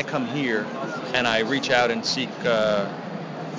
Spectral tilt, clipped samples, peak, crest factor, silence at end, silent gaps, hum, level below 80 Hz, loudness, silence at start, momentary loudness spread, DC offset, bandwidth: -4 dB/octave; under 0.1%; -4 dBFS; 20 dB; 0 s; none; none; -64 dBFS; -24 LUFS; 0 s; 10 LU; under 0.1%; 7.6 kHz